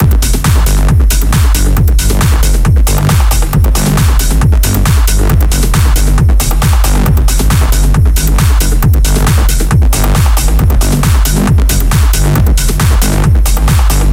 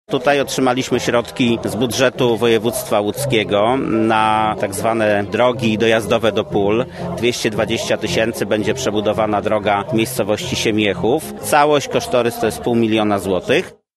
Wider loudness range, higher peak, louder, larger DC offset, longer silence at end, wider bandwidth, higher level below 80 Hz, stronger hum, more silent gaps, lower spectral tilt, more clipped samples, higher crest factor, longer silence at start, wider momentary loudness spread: about the same, 0 LU vs 2 LU; about the same, 0 dBFS vs 0 dBFS; first, -10 LUFS vs -17 LUFS; neither; second, 0 s vs 0.25 s; first, 16.5 kHz vs 13.5 kHz; first, -8 dBFS vs -48 dBFS; neither; neither; about the same, -5 dB/octave vs -4.5 dB/octave; neither; second, 8 dB vs 16 dB; about the same, 0 s vs 0.1 s; second, 1 LU vs 4 LU